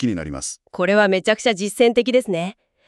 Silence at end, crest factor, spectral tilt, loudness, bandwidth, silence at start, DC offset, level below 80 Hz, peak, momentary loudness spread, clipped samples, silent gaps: 0.35 s; 16 dB; -4 dB/octave; -19 LUFS; 13 kHz; 0 s; under 0.1%; -50 dBFS; -2 dBFS; 12 LU; under 0.1%; none